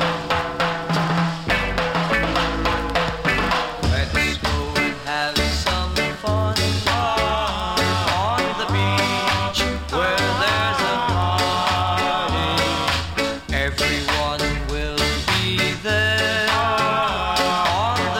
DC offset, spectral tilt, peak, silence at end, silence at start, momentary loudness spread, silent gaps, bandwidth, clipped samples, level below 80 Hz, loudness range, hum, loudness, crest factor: under 0.1%; -4 dB/octave; -6 dBFS; 0 s; 0 s; 4 LU; none; 17 kHz; under 0.1%; -32 dBFS; 1 LU; none; -20 LUFS; 16 dB